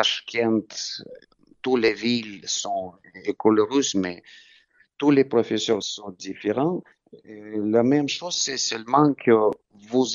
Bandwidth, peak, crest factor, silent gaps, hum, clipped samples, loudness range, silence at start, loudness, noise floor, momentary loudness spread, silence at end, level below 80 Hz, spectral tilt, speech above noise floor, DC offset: 7.6 kHz; -4 dBFS; 20 dB; none; none; under 0.1%; 3 LU; 0 s; -23 LUFS; -58 dBFS; 14 LU; 0 s; -70 dBFS; -4 dB/octave; 35 dB; under 0.1%